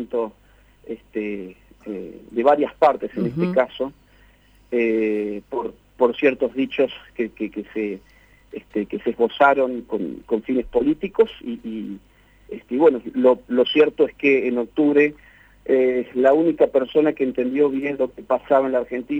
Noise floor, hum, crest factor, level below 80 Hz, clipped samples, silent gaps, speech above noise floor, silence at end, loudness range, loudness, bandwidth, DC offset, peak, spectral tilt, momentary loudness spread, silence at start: -53 dBFS; none; 18 dB; -54 dBFS; under 0.1%; none; 33 dB; 0 s; 5 LU; -21 LUFS; 7.4 kHz; under 0.1%; -2 dBFS; -7.5 dB/octave; 16 LU; 0 s